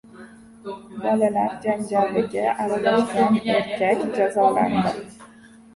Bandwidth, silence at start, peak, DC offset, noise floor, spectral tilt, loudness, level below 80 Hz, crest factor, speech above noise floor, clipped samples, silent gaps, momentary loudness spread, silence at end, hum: 11.5 kHz; 0.15 s; -6 dBFS; under 0.1%; -48 dBFS; -6 dB/octave; -21 LUFS; -58 dBFS; 16 dB; 27 dB; under 0.1%; none; 15 LU; 0.5 s; none